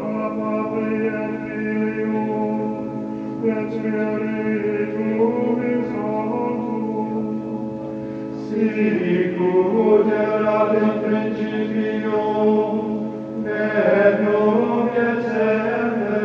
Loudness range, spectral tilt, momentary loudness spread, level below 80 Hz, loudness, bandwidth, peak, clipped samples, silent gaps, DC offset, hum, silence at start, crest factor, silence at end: 5 LU; -9 dB/octave; 9 LU; -60 dBFS; -21 LUFS; 6.4 kHz; -4 dBFS; under 0.1%; none; under 0.1%; none; 0 s; 16 dB; 0 s